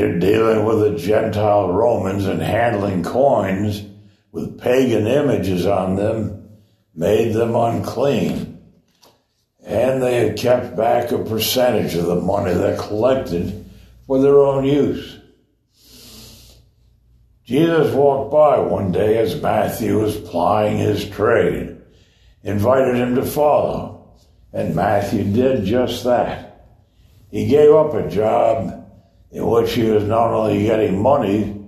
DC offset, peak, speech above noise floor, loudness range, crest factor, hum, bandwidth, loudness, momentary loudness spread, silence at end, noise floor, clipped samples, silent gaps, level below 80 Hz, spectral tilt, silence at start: under 0.1%; -2 dBFS; 46 dB; 3 LU; 16 dB; none; 13.5 kHz; -17 LUFS; 10 LU; 0 s; -62 dBFS; under 0.1%; none; -46 dBFS; -6.5 dB/octave; 0 s